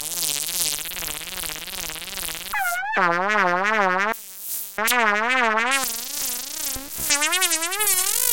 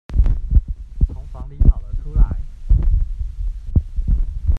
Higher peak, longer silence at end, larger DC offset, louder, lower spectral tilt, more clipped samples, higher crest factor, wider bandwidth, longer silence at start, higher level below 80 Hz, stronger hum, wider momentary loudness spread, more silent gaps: about the same, -2 dBFS vs 0 dBFS; about the same, 0 s vs 0 s; first, 0.4% vs under 0.1%; about the same, -22 LUFS vs -22 LUFS; second, -0.5 dB/octave vs -10 dB/octave; neither; first, 22 dB vs 16 dB; first, 17.5 kHz vs 2 kHz; about the same, 0 s vs 0.1 s; second, -52 dBFS vs -18 dBFS; neither; about the same, 10 LU vs 11 LU; neither